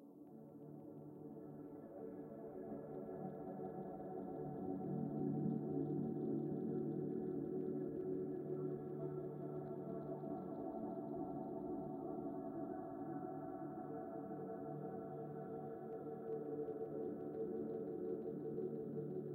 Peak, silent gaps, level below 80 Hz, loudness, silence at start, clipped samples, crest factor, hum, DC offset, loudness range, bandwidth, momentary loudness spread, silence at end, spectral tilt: -30 dBFS; none; -78 dBFS; -46 LUFS; 0 s; under 0.1%; 16 dB; none; under 0.1%; 7 LU; 15.5 kHz; 10 LU; 0 s; -12 dB/octave